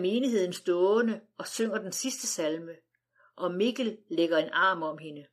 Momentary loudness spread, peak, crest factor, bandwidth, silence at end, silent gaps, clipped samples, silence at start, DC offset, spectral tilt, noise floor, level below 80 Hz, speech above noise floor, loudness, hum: 12 LU; -14 dBFS; 14 dB; 15.5 kHz; 0.1 s; none; under 0.1%; 0 s; under 0.1%; -3.5 dB/octave; -67 dBFS; -90 dBFS; 38 dB; -29 LUFS; none